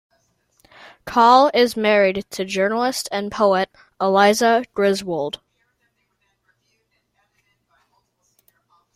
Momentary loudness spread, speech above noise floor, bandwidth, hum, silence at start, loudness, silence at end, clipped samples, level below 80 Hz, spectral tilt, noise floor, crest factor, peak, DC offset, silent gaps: 13 LU; 51 dB; 15.5 kHz; none; 1.05 s; -18 LUFS; 3.6 s; under 0.1%; -60 dBFS; -4 dB/octave; -69 dBFS; 20 dB; 0 dBFS; under 0.1%; none